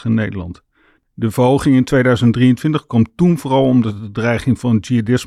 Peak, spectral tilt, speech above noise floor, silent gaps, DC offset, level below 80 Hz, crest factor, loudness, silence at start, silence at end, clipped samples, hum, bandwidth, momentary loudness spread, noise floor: -4 dBFS; -7.5 dB/octave; 41 dB; none; under 0.1%; -44 dBFS; 12 dB; -15 LUFS; 0.05 s; 0 s; under 0.1%; none; 13.5 kHz; 9 LU; -55 dBFS